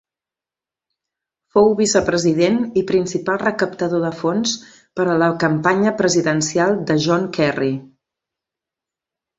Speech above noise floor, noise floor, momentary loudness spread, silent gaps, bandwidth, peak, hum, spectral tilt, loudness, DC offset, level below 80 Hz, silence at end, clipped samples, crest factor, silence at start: 72 dB; -89 dBFS; 6 LU; none; 8.4 kHz; -2 dBFS; none; -4.5 dB/octave; -18 LUFS; under 0.1%; -54 dBFS; 1.5 s; under 0.1%; 16 dB; 1.55 s